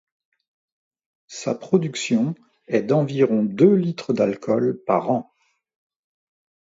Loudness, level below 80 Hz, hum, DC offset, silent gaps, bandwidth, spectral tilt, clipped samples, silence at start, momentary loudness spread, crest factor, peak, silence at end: -21 LUFS; -68 dBFS; none; under 0.1%; none; 7.8 kHz; -6.5 dB/octave; under 0.1%; 1.3 s; 11 LU; 18 dB; -4 dBFS; 1.45 s